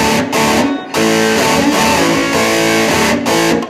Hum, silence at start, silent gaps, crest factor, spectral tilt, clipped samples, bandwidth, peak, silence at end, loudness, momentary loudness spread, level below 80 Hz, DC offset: none; 0 s; none; 12 dB; -3.5 dB/octave; under 0.1%; 16.5 kHz; 0 dBFS; 0 s; -12 LUFS; 2 LU; -38 dBFS; under 0.1%